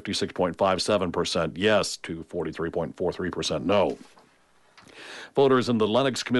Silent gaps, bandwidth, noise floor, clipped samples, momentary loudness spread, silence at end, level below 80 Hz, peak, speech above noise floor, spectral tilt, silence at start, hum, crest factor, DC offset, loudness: none; 11.5 kHz; -61 dBFS; under 0.1%; 12 LU; 0 s; -56 dBFS; -10 dBFS; 35 dB; -4.5 dB/octave; 0.05 s; none; 16 dB; under 0.1%; -25 LUFS